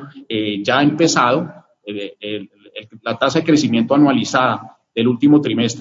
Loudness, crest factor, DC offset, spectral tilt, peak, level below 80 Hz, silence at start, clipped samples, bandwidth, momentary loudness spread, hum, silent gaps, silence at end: -16 LUFS; 16 dB; under 0.1%; -5 dB/octave; 0 dBFS; -62 dBFS; 0 s; under 0.1%; 7.8 kHz; 16 LU; none; none; 0 s